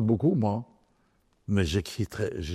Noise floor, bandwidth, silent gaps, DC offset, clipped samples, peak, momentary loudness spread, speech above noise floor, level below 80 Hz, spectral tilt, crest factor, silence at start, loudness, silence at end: -68 dBFS; 14 kHz; none; under 0.1%; under 0.1%; -10 dBFS; 14 LU; 41 dB; -50 dBFS; -7 dB/octave; 18 dB; 0 s; -28 LUFS; 0 s